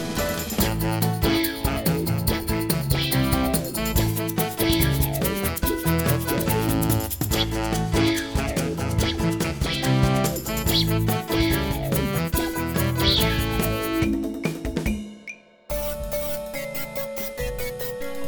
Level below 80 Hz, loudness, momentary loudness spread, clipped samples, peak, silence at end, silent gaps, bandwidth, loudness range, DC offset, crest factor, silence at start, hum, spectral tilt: -34 dBFS; -24 LUFS; 8 LU; under 0.1%; -6 dBFS; 0 s; none; over 20 kHz; 5 LU; under 0.1%; 18 dB; 0 s; none; -5 dB/octave